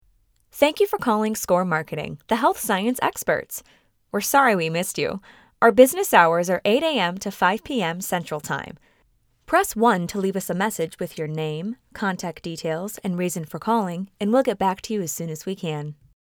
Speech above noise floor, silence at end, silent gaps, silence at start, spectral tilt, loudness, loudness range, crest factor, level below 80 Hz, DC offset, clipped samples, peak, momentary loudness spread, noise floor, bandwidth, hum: 41 dB; 0.45 s; none; 0.55 s; -4.5 dB/octave; -22 LUFS; 7 LU; 22 dB; -58 dBFS; under 0.1%; under 0.1%; 0 dBFS; 13 LU; -63 dBFS; over 20 kHz; none